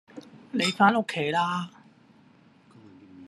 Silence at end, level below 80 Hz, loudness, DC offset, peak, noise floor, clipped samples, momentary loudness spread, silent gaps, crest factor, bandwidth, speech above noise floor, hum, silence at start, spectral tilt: 0 s; -74 dBFS; -25 LUFS; under 0.1%; -6 dBFS; -57 dBFS; under 0.1%; 22 LU; none; 22 dB; 12.5 kHz; 33 dB; none; 0.15 s; -4.5 dB/octave